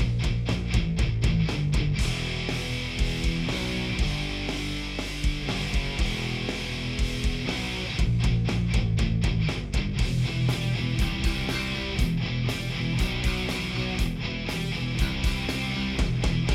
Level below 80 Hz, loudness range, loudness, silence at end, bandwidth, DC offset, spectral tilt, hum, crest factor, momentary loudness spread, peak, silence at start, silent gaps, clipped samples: -30 dBFS; 2 LU; -27 LUFS; 0 s; 15 kHz; under 0.1%; -5.5 dB/octave; none; 16 dB; 4 LU; -10 dBFS; 0 s; none; under 0.1%